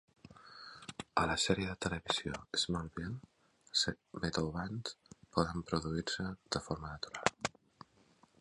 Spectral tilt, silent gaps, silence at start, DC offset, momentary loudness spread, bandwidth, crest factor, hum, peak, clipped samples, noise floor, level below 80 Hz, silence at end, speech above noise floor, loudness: -4 dB/octave; none; 0.25 s; under 0.1%; 15 LU; 11.5 kHz; 28 dB; none; -10 dBFS; under 0.1%; -68 dBFS; -56 dBFS; 0.95 s; 31 dB; -37 LUFS